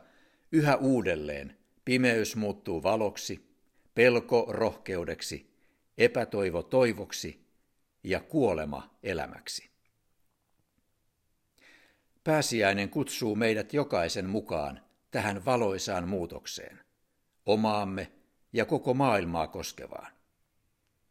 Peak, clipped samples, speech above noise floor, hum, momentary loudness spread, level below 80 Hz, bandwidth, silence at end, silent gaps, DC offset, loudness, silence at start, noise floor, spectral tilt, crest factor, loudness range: -8 dBFS; under 0.1%; 46 dB; none; 14 LU; -62 dBFS; 16 kHz; 1 s; none; under 0.1%; -30 LUFS; 0.5 s; -75 dBFS; -5 dB/octave; 24 dB; 6 LU